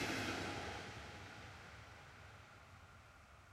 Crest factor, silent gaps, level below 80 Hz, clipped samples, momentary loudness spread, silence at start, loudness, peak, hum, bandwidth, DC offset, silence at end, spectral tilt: 20 dB; none; -66 dBFS; under 0.1%; 19 LU; 0 s; -48 LUFS; -28 dBFS; none; 16 kHz; under 0.1%; 0 s; -4 dB/octave